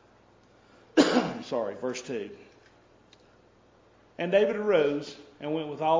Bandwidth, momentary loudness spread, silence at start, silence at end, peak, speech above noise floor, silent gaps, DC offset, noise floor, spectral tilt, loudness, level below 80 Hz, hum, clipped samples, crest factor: 7.6 kHz; 13 LU; 0.95 s; 0 s; -6 dBFS; 32 dB; none; under 0.1%; -60 dBFS; -5 dB/octave; -28 LUFS; -70 dBFS; none; under 0.1%; 24 dB